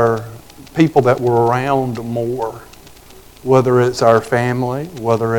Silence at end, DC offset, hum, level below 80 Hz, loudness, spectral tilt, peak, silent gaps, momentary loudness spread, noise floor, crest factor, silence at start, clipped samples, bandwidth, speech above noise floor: 0 s; under 0.1%; none; -48 dBFS; -16 LUFS; -7 dB/octave; 0 dBFS; none; 13 LU; -41 dBFS; 16 dB; 0 s; under 0.1%; 19 kHz; 26 dB